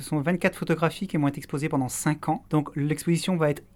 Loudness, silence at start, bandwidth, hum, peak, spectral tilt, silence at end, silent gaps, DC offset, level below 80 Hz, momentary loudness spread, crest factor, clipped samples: -26 LUFS; 0 s; 17.5 kHz; none; -8 dBFS; -6 dB/octave; 0.1 s; none; under 0.1%; -56 dBFS; 3 LU; 18 dB; under 0.1%